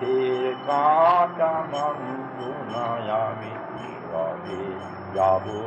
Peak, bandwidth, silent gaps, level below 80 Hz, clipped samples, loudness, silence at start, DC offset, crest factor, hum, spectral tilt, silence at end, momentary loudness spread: -8 dBFS; 8.2 kHz; none; -66 dBFS; under 0.1%; -25 LUFS; 0 s; under 0.1%; 16 dB; none; -6.5 dB/octave; 0 s; 15 LU